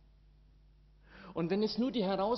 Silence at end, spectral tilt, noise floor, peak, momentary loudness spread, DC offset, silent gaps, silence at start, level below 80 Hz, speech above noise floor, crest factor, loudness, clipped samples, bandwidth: 0 s; -5 dB/octave; -62 dBFS; -20 dBFS; 12 LU; under 0.1%; none; 1.1 s; -62 dBFS; 30 dB; 16 dB; -34 LUFS; under 0.1%; 6 kHz